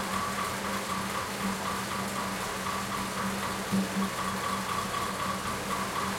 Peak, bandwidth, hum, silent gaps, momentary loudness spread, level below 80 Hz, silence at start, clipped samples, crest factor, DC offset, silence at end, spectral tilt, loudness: -18 dBFS; 16.5 kHz; none; none; 2 LU; -56 dBFS; 0 s; under 0.1%; 14 dB; under 0.1%; 0 s; -3.5 dB/octave; -31 LUFS